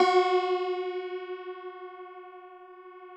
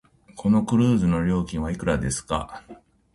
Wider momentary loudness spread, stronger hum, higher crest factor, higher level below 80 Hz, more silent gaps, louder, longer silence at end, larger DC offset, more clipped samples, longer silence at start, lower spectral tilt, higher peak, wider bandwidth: first, 23 LU vs 10 LU; neither; about the same, 18 dB vs 16 dB; second, -90 dBFS vs -40 dBFS; neither; second, -29 LUFS vs -23 LUFS; second, 0 s vs 0.4 s; neither; neither; second, 0 s vs 0.35 s; second, -3 dB/octave vs -6.5 dB/octave; second, -12 dBFS vs -8 dBFS; second, 8.6 kHz vs 11.5 kHz